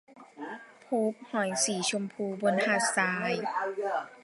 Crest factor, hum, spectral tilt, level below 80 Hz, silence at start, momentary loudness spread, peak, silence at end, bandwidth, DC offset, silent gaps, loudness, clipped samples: 20 dB; none; -3 dB/octave; -82 dBFS; 0.1 s; 16 LU; -12 dBFS; 0.05 s; 11.5 kHz; under 0.1%; none; -29 LUFS; under 0.1%